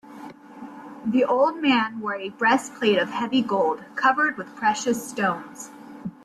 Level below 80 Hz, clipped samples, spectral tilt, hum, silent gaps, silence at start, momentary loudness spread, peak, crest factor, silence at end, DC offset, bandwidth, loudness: -68 dBFS; under 0.1%; -4 dB/octave; none; none; 0.05 s; 20 LU; -6 dBFS; 18 dB; 0.15 s; under 0.1%; 13.5 kHz; -23 LUFS